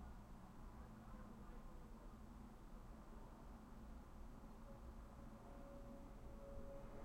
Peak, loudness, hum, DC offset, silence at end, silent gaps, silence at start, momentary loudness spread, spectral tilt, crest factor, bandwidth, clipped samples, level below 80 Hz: -42 dBFS; -60 LUFS; none; under 0.1%; 0 s; none; 0 s; 3 LU; -7 dB/octave; 14 dB; 16 kHz; under 0.1%; -60 dBFS